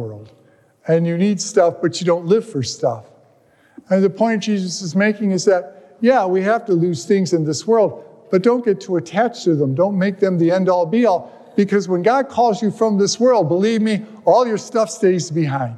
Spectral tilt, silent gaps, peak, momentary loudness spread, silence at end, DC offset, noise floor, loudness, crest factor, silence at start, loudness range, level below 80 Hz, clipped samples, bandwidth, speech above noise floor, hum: -6 dB/octave; none; -2 dBFS; 5 LU; 0 s; under 0.1%; -54 dBFS; -17 LUFS; 14 dB; 0 s; 3 LU; -70 dBFS; under 0.1%; 11.5 kHz; 37 dB; none